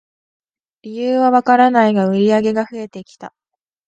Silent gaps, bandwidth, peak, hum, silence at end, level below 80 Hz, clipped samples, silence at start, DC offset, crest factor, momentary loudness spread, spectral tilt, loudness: none; 8.6 kHz; 0 dBFS; none; 0.6 s; -64 dBFS; under 0.1%; 0.85 s; under 0.1%; 16 dB; 19 LU; -7 dB/octave; -14 LUFS